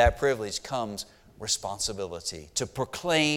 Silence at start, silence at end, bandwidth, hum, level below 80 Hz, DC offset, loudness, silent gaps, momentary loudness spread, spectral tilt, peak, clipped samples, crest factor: 0 s; 0 s; 17.5 kHz; none; -42 dBFS; under 0.1%; -30 LUFS; none; 10 LU; -3 dB/octave; -8 dBFS; under 0.1%; 20 dB